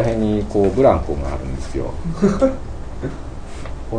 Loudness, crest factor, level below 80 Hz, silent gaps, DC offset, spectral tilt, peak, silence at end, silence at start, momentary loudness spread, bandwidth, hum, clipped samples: -20 LUFS; 18 dB; -28 dBFS; none; under 0.1%; -8 dB/octave; -2 dBFS; 0 s; 0 s; 18 LU; 10 kHz; none; under 0.1%